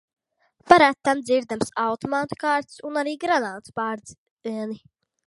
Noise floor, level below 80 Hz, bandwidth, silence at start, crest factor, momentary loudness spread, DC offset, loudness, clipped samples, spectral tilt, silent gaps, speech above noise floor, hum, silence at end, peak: -64 dBFS; -62 dBFS; 11.5 kHz; 0.65 s; 24 dB; 17 LU; under 0.1%; -23 LUFS; under 0.1%; -4.5 dB/octave; 4.18-4.37 s; 41 dB; none; 0.5 s; 0 dBFS